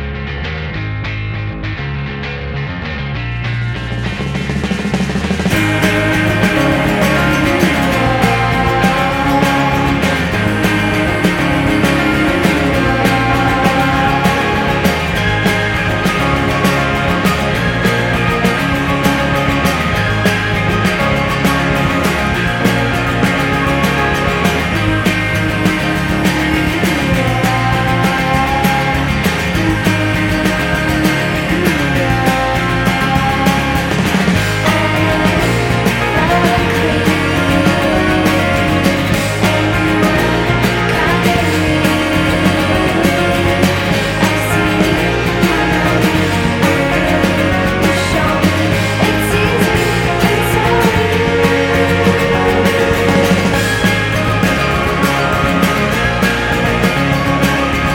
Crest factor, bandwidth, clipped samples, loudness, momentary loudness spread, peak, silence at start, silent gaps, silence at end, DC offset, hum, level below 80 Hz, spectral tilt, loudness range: 14 dB; 17 kHz; under 0.1%; -13 LUFS; 3 LU; 0 dBFS; 0 s; none; 0 s; under 0.1%; none; -28 dBFS; -5.5 dB/octave; 1 LU